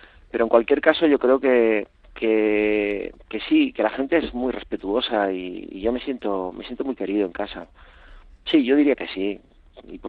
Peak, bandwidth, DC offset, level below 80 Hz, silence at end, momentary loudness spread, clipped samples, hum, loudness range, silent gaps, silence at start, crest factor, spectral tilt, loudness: 0 dBFS; 4.7 kHz; under 0.1%; -50 dBFS; 0 s; 14 LU; under 0.1%; none; 6 LU; none; 0.35 s; 22 dB; -7.5 dB/octave; -22 LUFS